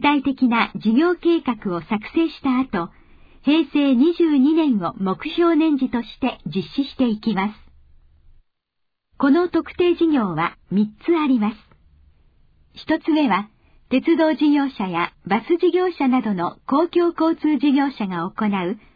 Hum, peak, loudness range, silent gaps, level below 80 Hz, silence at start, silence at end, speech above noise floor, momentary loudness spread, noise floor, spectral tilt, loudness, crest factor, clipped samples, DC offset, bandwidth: none; -4 dBFS; 4 LU; none; -52 dBFS; 0 s; 0.2 s; 56 dB; 8 LU; -75 dBFS; -8.5 dB/octave; -20 LUFS; 16 dB; under 0.1%; under 0.1%; 5 kHz